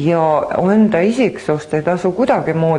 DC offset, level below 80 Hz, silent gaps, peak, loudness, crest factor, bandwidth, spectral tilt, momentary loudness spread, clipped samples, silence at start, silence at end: under 0.1%; -50 dBFS; none; -2 dBFS; -15 LUFS; 12 dB; 11 kHz; -7.5 dB/octave; 5 LU; under 0.1%; 0 s; 0 s